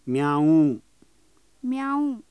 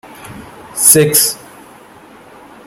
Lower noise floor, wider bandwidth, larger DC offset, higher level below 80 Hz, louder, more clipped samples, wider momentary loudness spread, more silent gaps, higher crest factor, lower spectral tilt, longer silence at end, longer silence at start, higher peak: first, -63 dBFS vs -39 dBFS; second, 11 kHz vs over 20 kHz; neither; second, -70 dBFS vs -52 dBFS; second, -22 LUFS vs -9 LUFS; second, under 0.1% vs 0.4%; second, 14 LU vs 26 LU; neither; about the same, 14 dB vs 16 dB; first, -8 dB/octave vs -2.5 dB/octave; second, 0.1 s vs 1.3 s; second, 0.05 s vs 0.2 s; second, -10 dBFS vs 0 dBFS